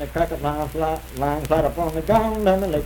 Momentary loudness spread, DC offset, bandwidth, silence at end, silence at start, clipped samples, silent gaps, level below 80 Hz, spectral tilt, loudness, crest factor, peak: 6 LU; under 0.1%; 19 kHz; 0 s; 0 s; under 0.1%; none; -34 dBFS; -6.5 dB/octave; -22 LUFS; 18 dB; -4 dBFS